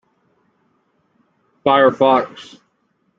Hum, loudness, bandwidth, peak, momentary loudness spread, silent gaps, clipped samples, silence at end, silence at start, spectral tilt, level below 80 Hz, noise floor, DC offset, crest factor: none; -15 LUFS; 7.4 kHz; -2 dBFS; 18 LU; none; under 0.1%; 0.75 s; 1.65 s; -6 dB/octave; -64 dBFS; -65 dBFS; under 0.1%; 18 dB